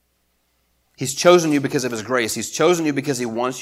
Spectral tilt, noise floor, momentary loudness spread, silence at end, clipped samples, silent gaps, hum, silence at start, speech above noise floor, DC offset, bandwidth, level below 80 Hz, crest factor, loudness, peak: -4 dB/octave; -67 dBFS; 9 LU; 0 s; under 0.1%; none; none; 1 s; 48 dB; under 0.1%; 16 kHz; -64 dBFS; 20 dB; -19 LUFS; 0 dBFS